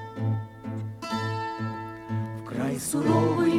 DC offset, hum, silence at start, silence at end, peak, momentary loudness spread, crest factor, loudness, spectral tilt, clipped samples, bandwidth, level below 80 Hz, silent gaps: under 0.1%; none; 0 s; 0 s; -10 dBFS; 12 LU; 18 dB; -29 LUFS; -6 dB/octave; under 0.1%; 15.5 kHz; -60 dBFS; none